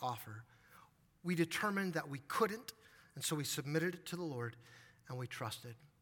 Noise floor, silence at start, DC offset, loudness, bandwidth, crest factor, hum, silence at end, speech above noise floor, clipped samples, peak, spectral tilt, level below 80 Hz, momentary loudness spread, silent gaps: -66 dBFS; 0 s; under 0.1%; -40 LUFS; 18 kHz; 20 dB; none; 0.15 s; 26 dB; under 0.1%; -22 dBFS; -4.5 dB/octave; -80 dBFS; 19 LU; none